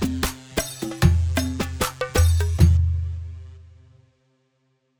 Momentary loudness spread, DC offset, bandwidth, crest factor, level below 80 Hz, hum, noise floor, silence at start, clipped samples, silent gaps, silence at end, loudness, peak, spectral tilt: 13 LU; under 0.1%; over 20 kHz; 20 dB; -28 dBFS; none; -69 dBFS; 0 s; under 0.1%; none; 1.35 s; -22 LUFS; -2 dBFS; -5.5 dB/octave